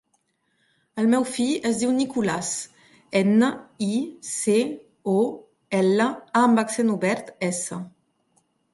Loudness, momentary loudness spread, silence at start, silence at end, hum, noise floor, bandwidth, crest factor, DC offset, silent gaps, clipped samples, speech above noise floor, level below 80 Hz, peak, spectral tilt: -23 LUFS; 11 LU; 0.95 s; 0.85 s; none; -70 dBFS; 11.5 kHz; 18 dB; under 0.1%; none; under 0.1%; 48 dB; -68 dBFS; -6 dBFS; -5 dB/octave